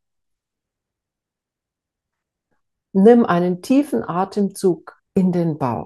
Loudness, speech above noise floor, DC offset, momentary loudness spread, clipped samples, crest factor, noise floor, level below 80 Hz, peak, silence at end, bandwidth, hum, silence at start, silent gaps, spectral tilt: -18 LUFS; 69 dB; under 0.1%; 10 LU; under 0.1%; 20 dB; -86 dBFS; -62 dBFS; 0 dBFS; 0 s; 12.5 kHz; none; 2.95 s; none; -8 dB/octave